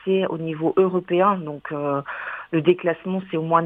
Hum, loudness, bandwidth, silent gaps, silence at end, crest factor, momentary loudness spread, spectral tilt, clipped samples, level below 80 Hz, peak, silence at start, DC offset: none; -23 LUFS; 3.8 kHz; none; 0 s; 18 dB; 8 LU; -9.5 dB/octave; under 0.1%; -66 dBFS; -4 dBFS; 0.05 s; under 0.1%